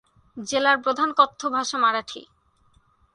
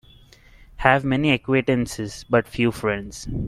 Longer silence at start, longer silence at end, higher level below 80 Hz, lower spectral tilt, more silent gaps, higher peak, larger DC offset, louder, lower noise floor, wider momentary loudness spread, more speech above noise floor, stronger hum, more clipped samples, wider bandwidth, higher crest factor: second, 0.35 s vs 0.8 s; first, 0.9 s vs 0 s; second, -66 dBFS vs -42 dBFS; second, -1.5 dB/octave vs -6 dB/octave; neither; second, -4 dBFS vs 0 dBFS; neither; about the same, -22 LUFS vs -22 LUFS; first, -61 dBFS vs -50 dBFS; first, 17 LU vs 10 LU; first, 39 dB vs 29 dB; neither; neither; second, 11 kHz vs 14.5 kHz; about the same, 22 dB vs 22 dB